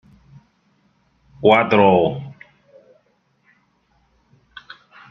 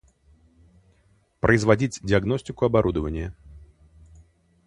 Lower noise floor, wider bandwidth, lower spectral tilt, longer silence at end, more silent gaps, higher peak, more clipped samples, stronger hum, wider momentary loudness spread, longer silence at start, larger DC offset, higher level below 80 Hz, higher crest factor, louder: about the same, -63 dBFS vs -62 dBFS; second, 6.2 kHz vs 11 kHz; first, -8 dB/octave vs -6.5 dB/octave; first, 2.8 s vs 1 s; neither; about the same, 0 dBFS vs -2 dBFS; neither; neither; first, 26 LU vs 11 LU; about the same, 1.4 s vs 1.45 s; neither; second, -60 dBFS vs -42 dBFS; about the same, 22 dB vs 24 dB; first, -15 LUFS vs -23 LUFS